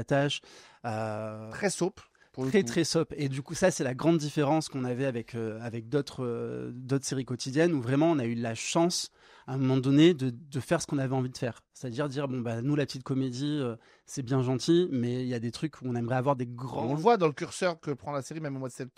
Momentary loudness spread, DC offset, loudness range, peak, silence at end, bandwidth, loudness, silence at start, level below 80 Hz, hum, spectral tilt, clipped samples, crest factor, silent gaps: 11 LU; under 0.1%; 4 LU; -10 dBFS; 0.1 s; 14.5 kHz; -30 LUFS; 0 s; -66 dBFS; none; -5.5 dB/octave; under 0.1%; 20 dB; none